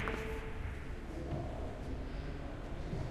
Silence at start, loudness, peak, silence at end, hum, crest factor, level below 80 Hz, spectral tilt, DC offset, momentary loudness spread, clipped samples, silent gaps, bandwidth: 0 s; -43 LUFS; -20 dBFS; 0 s; none; 20 dB; -44 dBFS; -7 dB/octave; under 0.1%; 4 LU; under 0.1%; none; 14 kHz